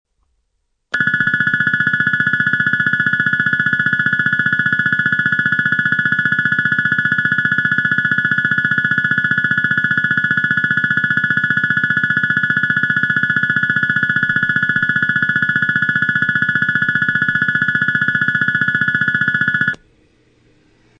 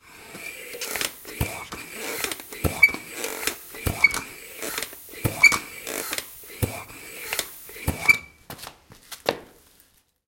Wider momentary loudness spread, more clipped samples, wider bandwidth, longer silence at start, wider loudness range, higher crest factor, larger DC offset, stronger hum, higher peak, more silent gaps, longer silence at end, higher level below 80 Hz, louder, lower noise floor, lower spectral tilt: second, 0 LU vs 20 LU; neither; second, 7.2 kHz vs 17 kHz; first, 0.95 s vs 0.05 s; second, 0 LU vs 4 LU; second, 16 dB vs 26 dB; neither; neither; about the same, 0 dBFS vs -2 dBFS; neither; first, 1.25 s vs 0.8 s; second, -52 dBFS vs -46 dBFS; first, -15 LUFS vs -24 LUFS; first, -68 dBFS vs -60 dBFS; first, -5.5 dB/octave vs -2.5 dB/octave